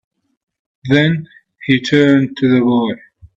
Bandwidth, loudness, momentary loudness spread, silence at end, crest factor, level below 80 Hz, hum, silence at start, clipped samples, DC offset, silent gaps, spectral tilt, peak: 7.6 kHz; -14 LUFS; 15 LU; 0.1 s; 16 dB; -54 dBFS; none; 0.85 s; under 0.1%; under 0.1%; none; -7 dB/octave; 0 dBFS